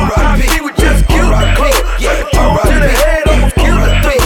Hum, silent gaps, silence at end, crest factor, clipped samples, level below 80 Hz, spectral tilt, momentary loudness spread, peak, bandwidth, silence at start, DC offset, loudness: none; none; 0 s; 8 dB; under 0.1%; -12 dBFS; -5 dB/octave; 2 LU; 0 dBFS; 17.5 kHz; 0 s; under 0.1%; -11 LUFS